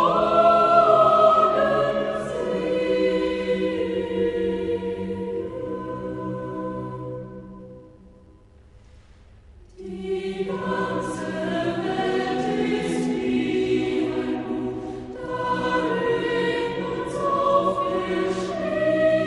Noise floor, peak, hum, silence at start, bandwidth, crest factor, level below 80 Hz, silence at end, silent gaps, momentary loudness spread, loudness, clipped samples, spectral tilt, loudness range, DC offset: -51 dBFS; -4 dBFS; none; 0 s; 11.5 kHz; 18 dB; -50 dBFS; 0 s; none; 15 LU; -23 LUFS; under 0.1%; -6 dB/octave; 14 LU; under 0.1%